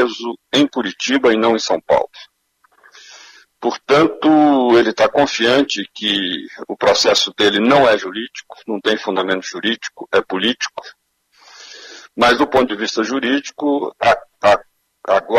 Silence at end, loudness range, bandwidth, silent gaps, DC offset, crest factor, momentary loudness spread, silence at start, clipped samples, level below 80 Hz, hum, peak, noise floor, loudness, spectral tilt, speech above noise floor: 0 s; 6 LU; 13.5 kHz; none; under 0.1%; 14 dB; 14 LU; 0 s; under 0.1%; -54 dBFS; none; -4 dBFS; -58 dBFS; -16 LUFS; -3.5 dB/octave; 42 dB